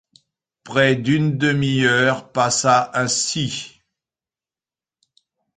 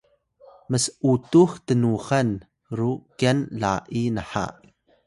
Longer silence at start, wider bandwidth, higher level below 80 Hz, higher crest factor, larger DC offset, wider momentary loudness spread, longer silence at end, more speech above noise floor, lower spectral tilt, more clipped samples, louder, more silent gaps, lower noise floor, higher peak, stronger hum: about the same, 0.65 s vs 0.7 s; second, 9.6 kHz vs 11.5 kHz; about the same, -56 dBFS vs -52 dBFS; about the same, 18 dB vs 18 dB; neither; second, 8 LU vs 11 LU; first, 1.9 s vs 0.55 s; first, over 72 dB vs 32 dB; second, -4 dB/octave vs -6 dB/octave; neither; first, -18 LUFS vs -23 LUFS; neither; first, under -90 dBFS vs -54 dBFS; first, -2 dBFS vs -6 dBFS; neither